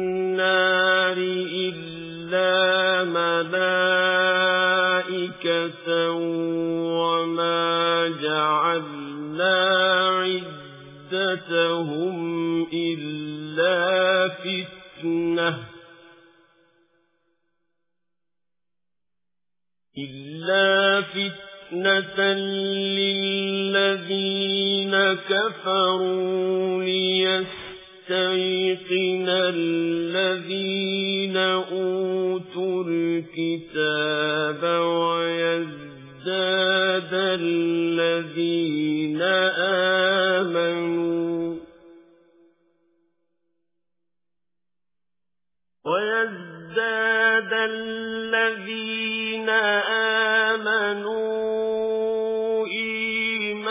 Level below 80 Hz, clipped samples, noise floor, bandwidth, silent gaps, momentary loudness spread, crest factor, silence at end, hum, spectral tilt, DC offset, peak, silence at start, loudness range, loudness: -70 dBFS; under 0.1%; -89 dBFS; 3.9 kHz; none; 10 LU; 16 dB; 0 s; none; -8.5 dB/octave; under 0.1%; -8 dBFS; 0 s; 5 LU; -22 LUFS